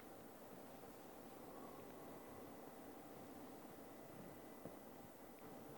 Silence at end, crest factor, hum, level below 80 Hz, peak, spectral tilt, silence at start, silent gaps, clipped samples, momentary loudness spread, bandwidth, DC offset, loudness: 0 s; 18 dB; none; -80 dBFS; -38 dBFS; -5 dB/octave; 0 s; none; under 0.1%; 2 LU; 18 kHz; under 0.1%; -57 LUFS